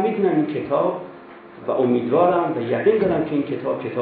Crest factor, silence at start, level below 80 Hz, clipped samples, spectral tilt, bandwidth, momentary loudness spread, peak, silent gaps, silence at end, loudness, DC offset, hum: 18 dB; 0 s; -58 dBFS; under 0.1%; -11.5 dB/octave; 4.7 kHz; 8 LU; -4 dBFS; none; 0 s; -20 LUFS; under 0.1%; none